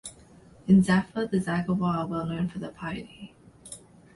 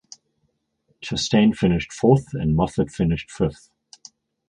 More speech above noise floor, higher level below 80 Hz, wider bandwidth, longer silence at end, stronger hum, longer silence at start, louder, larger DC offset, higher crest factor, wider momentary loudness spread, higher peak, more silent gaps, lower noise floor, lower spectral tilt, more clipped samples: second, 27 dB vs 51 dB; second, -54 dBFS vs -42 dBFS; about the same, 11.5 kHz vs 10.5 kHz; second, 0.4 s vs 0.95 s; neither; second, 0.05 s vs 1 s; second, -26 LUFS vs -21 LUFS; neither; about the same, 18 dB vs 20 dB; first, 23 LU vs 8 LU; second, -8 dBFS vs -2 dBFS; neither; second, -53 dBFS vs -71 dBFS; about the same, -7 dB/octave vs -6.5 dB/octave; neither